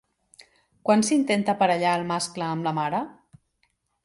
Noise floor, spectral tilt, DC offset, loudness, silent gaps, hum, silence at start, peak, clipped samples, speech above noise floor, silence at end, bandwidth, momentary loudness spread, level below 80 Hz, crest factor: -71 dBFS; -4.5 dB/octave; under 0.1%; -24 LUFS; none; none; 0.85 s; -8 dBFS; under 0.1%; 48 dB; 0.95 s; 11.5 kHz; 9 LU; -68 dBFS; 18 dB